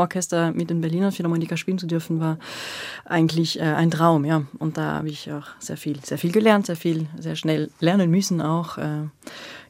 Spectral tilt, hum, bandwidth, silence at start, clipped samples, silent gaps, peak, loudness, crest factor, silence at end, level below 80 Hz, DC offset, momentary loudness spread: -6 dB/octave; none; 16 kHz; 0 s; under 0.1%; none; -2 dBFS; -23 LUFS; 20 dB; 0.05 s; -66 dBFS; under 0.1%; 13 LU